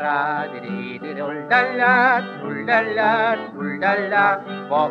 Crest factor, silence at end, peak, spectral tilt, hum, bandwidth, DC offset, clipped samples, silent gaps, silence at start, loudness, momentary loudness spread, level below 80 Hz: 18 dB; 0 s; -2 dBFS; -7 dB/octave; none; 7.2 kHz; under 0.1%; under 0.1%; none; 0 s; -20 LUFS; 12 LU; -76 dBFS